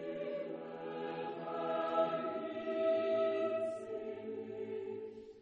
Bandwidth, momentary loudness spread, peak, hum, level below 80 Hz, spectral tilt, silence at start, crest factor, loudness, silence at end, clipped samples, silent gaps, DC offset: 9.4 kHz; 11 LU; -22 dBFS; none; -82 dBFS; -6.5 dB/octave; 0 s; 16 dB; -38 LUFS; 0 s; under 0.1%; none; under 0.1%